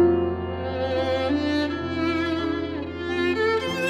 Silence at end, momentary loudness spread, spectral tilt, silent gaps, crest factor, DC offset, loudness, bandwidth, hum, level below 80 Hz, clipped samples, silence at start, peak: 0 s; 6 LU; -6.5 dB/octave; none; 14 dB; under 0.1%; -25 LUFS; 12 kHz; none; -46 dBFS; under 0.1%; 0 s; -10 dBFS